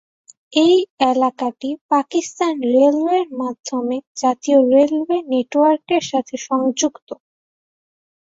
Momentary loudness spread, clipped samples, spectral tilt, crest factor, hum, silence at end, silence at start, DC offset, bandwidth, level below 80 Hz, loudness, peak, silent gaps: 10 LU; under 0.1%; -3 dB/octave; 16 dB; none; 1.25 s; 0.5 s; under 0.1%; 8 kHz; -66 dBFS; -18 LUFS; -2 dBFS; 0.90-0.97 s, 1.81-1.89 s, 3.60-3.64 s, 4.07-4.15 s, 7.02-7.07 s